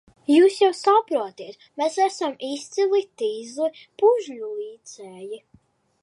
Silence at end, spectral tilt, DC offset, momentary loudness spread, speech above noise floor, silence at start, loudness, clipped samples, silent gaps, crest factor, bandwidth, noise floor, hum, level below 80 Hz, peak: 0.65 s; -3 dB/octave; under 0.1%; 20 LU; 37 dB; 0.3 s; -22 LUFS; under 0.1%; none; 16 dB; 11.5 kHz; -59 dBFS; none; -76 dBFS; -6 dBFS